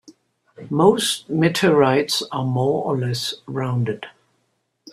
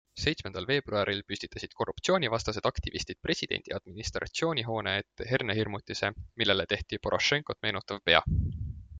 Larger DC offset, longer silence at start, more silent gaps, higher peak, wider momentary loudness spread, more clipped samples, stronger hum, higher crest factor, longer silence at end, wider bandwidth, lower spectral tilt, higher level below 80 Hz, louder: neither; first, 0.6 s vs 0.15 s; neither; about the same, -2 dBFS vs -4 dBFS; about the same, 10 LU vs 9 LU; neither; neither; second, 18 dB vs 26 dB; about the same, 0 s vs 0 s; first, 14.5 kHz vs 9.4 kHz; about the same, -5 dB/octave vs -4 dB/octave; second, -60 dBFS vs -46 dBFS; first, -20 LUFS vs -30 LUFS